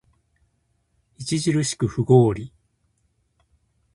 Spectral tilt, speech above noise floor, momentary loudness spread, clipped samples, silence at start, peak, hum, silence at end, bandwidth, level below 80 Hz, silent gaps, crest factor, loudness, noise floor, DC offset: -6 dB/octave; 49 dB; 17 LU; under 0.1%; 1.2 s; -2 dBFS; none; 1.45 s; 11.5 kHz; -52 dBFS; none; 22 dB; -21 LUFS; -69 dBFS; under 0.1%